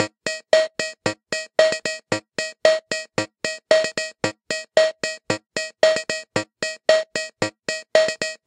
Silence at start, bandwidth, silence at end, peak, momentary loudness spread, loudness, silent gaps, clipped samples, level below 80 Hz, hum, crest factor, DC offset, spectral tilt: 0 s; 11 kHz; 0.1 s; 0 dBFS; 9 LU; -22 LUFS; none; under 0.1%; -66 dBFS; none; 22 dB; under 0.1%; -2.5 dB/octave